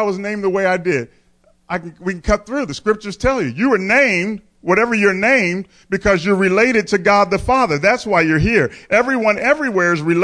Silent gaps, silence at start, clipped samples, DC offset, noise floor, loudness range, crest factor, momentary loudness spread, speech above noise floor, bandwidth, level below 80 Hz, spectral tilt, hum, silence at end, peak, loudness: none; 0 s; under 0.1%; under 0.1%; -55 dBFS; 5 LU; 14 dB; 10 LU; 39 dB; 10.5 kHz; -38 dBFS; -5.5 dB/octave; none; 0 s; -2 dBFS; -16 LUFS